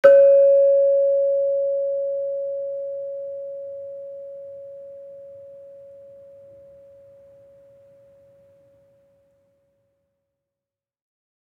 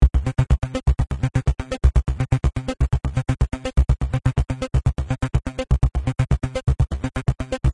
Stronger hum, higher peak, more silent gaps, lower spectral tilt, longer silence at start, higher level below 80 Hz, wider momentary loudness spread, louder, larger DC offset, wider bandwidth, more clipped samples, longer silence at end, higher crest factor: neither; about the same, -2 dBFS vs -2 dBFS; neither; second, -5.5 dB/octave vs -7.5 dB/octave; about the same, 0.05 s vs 0 s; second, -80 dBFS vs -22 dBFS; first, 27 LU vs 4 LU; first, -19 LUFS vs -23 LUFS; neither; second, 3.2 kHz vs 11 kHz; neither; first, 5.85 s vs 0 s; about the same, 22 dB vs 18 dB